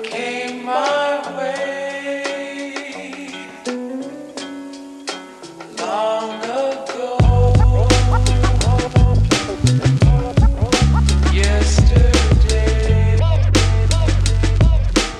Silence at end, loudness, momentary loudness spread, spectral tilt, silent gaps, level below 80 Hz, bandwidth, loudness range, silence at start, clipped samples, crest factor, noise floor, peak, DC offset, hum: 0 s; -17 LUFS; 16 LU; -5.5 dB/octave; none; -20 dBFS; 11.5 kHz; 12 LU; 0 s; under 0.1%; 14 dB; -35 dBFS; -2 dBFS; under 0.1%; none